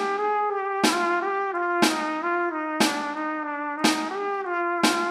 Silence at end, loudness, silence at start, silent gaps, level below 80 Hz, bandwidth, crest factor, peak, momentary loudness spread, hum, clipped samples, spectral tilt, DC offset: 0 s; -25 LUFS; 0 s; none; -76 dBFS; 15.5 kHz; 20 dB; -4 dBFS; 6 LU; none; under 0.1%; -2.5 dB/octave; under 0.1%